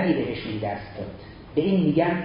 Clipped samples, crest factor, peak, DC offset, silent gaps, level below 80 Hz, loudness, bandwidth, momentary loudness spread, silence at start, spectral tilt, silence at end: under 0.1%; 16 dB; -8 dBFS; under 0.1%; none; -50 dBFS; -25 LUFS; 5.4 kHz; 16 LU; 0 s; -11.5 dB/octave; 0 s